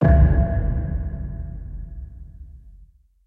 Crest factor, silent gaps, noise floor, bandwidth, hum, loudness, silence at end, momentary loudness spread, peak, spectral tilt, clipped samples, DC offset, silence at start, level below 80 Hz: 18 dB; none; -51 dBFS; 2.9 kHz; none; -22 LUFS; 0.45 s; 25 LU; -4 dBFS; -12 dB/octave; under 0.1%; under 0.1%; 0 s; -24 dBFS